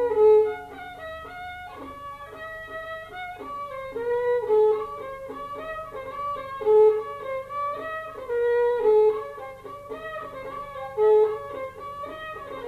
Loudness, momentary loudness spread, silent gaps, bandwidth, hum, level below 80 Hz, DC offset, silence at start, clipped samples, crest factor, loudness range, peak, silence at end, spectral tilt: -25 LUFS; 18 LU; none; 4.7 kHz; none; -56 dBFS; under 0.1%; 0 s; under 0.1%; 16 dB; 9 LU; -10 dBFS; 0 s; -5.5 dB/octave